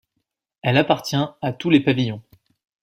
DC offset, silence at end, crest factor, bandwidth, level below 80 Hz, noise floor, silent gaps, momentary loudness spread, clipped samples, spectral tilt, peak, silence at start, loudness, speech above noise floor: under 0.1%; 0.65 s; 20 dB; 16 kHz; -58 dBFS; -77 dBFS; none; 9 LU; under 0.1%; -6 dB/octave; -2 dBFS; 0.65 s; -20 LUFS; 57 dB